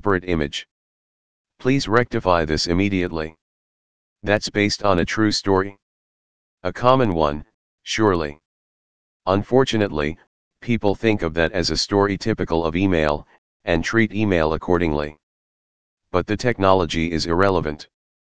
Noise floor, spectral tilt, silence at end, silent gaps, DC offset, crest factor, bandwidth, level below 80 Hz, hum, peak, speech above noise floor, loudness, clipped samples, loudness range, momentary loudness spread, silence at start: under -90 dBFS; -5.5 dB/octave; 0.3 s; 0.71-1.45 s, 3.41-4.16 s, 5.82-6.58 s, 7.54-7.78 s, 8.45-9.20 s, 10.27-10.51 s, 13.38-13.60 s, 15.23-15.97 s; 2%; 22 dB; 9.8 kHz; -40 dBFS; none; 0 dBFS; over 70 dB; -20 LUFS; under 0.1%; 2 LU; 12 LU; 0 s